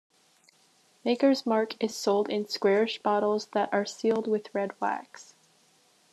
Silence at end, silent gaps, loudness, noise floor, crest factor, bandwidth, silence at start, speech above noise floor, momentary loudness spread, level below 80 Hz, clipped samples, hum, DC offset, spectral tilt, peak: 0.9 s; none; -28 LUFS; -64 dBFS; 16 dB; 13 kHz; 1.05 s; 37 dB; 7 LU; -84 dBFS; under 0.1%; none; under 0.1%; -4.5 dB/octave; -12 dBFS